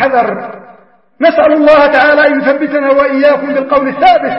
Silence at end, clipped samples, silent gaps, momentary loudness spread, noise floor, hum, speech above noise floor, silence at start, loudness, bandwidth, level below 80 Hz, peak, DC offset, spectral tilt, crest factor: 0 s; 0.3%; none; 7 LU; -41 dBFS; none; 33 dB; 0 s; -9 LUFS; 5.8 kHz; -44 dBFS; 0 dBFS; 0.3%; -6.5 dB/octave; 10 dB